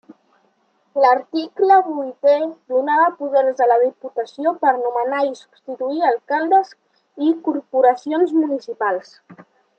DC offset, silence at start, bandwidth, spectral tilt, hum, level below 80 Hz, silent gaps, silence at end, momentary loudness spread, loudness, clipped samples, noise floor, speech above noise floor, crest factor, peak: under 0.1%; 0.1 s; 8 kHz; -5 dB/octave; none; -82 dBFS; none; 0.45 s; 10 LU; -18 LUFS; under 0.1%; -63 dBFS; 45 dB; 16 dB; -2 dBFS